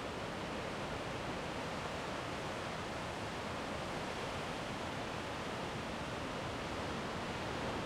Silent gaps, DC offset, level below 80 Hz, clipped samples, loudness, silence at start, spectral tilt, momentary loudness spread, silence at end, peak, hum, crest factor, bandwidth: none; under 0.1%; -58 dBFS; under 0.1%; -41 LUFS; 0 s; -4.5 dB/octave; 1 LU; 0 s; -26 dBFS; none; 14 dB; 16 kHz